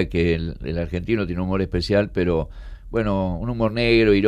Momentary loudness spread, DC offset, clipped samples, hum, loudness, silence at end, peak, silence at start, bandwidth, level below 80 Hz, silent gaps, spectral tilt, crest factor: 10 LU; under 0.1%; under 0.1%; none; -22 LUFS; 0 s; -6 dBFS; 0 s; 10 kHz; -34 dBFS; none; -7.5 dB/octave; 16 dB